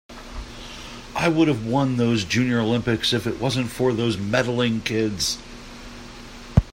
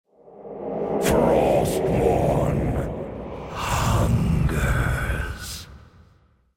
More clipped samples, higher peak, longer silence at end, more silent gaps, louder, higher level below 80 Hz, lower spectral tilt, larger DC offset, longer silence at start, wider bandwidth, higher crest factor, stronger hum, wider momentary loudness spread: neither; first, -2 dBFS vs -6 dBFS; second, 0 s vs 0.8 s; neither; about the same, -22 LUFS vs -23 LUFS; second, -40 dBFS vs -32 dBFS; about the same, -5 dB/octave vs -6 dB/octave; neither; second, 0.1 s vs 0.25 s; about the same, 16 kHz vs 16.5 kHz; first, 22 dB vs 16 dB; neither; first, 19 LU vs 14 LU